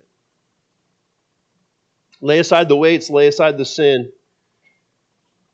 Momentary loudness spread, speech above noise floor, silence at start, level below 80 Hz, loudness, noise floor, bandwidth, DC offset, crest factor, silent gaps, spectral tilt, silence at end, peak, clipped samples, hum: 7 LU; 54 dB; 2.2 s; -74 dBFS; -14 LUFS; -68 dBFS; 8 kHz; under 0.1%; 18 dB; none; -5 dB/octave; 1.45 s; 0 dBFS; under 0.1%; none